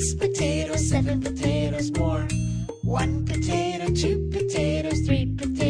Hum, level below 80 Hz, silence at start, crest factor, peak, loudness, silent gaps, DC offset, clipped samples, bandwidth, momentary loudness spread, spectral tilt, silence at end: none; -34 dBFS; 0 s; 14 dB; -10 dBFS; -25 LUFS; none; under 0.1%; under 0.1%; 10.5 kHz; 3 LU; -5.5 dB/octave; 0 s